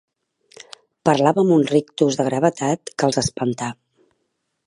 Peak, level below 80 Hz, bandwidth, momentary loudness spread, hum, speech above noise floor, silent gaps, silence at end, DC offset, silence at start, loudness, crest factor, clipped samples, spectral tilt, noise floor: -2 dBFS; -54 dBFS; 11.5 kHz; 8 LU; none; 55 dB; none; 0.95 s; under 0.1%; 1.05 s; -19 LUFS; 20 dB; under 0.1%; -5.5 dB/octave; -73 dBFS